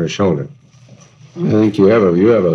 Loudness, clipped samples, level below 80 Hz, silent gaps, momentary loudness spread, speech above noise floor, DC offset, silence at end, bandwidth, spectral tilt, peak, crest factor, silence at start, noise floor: -13 LUFS; under 0.1%; -52 dBFS; none; 11 LU; 31 dB; under 0.1%; 0 s; 7.8 kHz; -7.5 dB/octave; 0 dBFS; 14 dB; 0 s; -43 dBFS